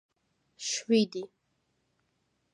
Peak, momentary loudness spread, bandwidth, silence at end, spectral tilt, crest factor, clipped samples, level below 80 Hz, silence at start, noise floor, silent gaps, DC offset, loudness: -14 dBFS; 15 LU; 11 kHz; 1.3 s; -3.5 dB/octave; 20 dB; under 0.1%; -84 dBFS; 0.6 s; -77 dBFS; none; under 0.1%; -29 LUFS